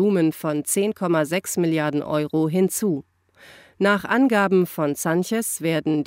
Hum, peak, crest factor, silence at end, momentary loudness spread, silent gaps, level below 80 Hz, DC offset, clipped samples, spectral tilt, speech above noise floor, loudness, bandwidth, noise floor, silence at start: none; -6 dBFS; 16 dB; 0 s; 5 LU; none; -66 dBFS; under 0.1%; under 0.1%; -5 dB/octave; 29 dB; -22 LUFS; 16.5 kHz; -50 dBFS; 0 s